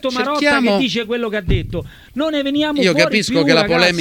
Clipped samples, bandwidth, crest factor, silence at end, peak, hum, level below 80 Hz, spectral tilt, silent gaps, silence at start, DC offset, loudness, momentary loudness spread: under 0.1%; 18 kHz; 16 dB; 0 s; 0 dBFS; none; -32 dBFS; -4.5 dB/octave; none; 0.05 s; under 0.1%; -16 LUFS; 8 LU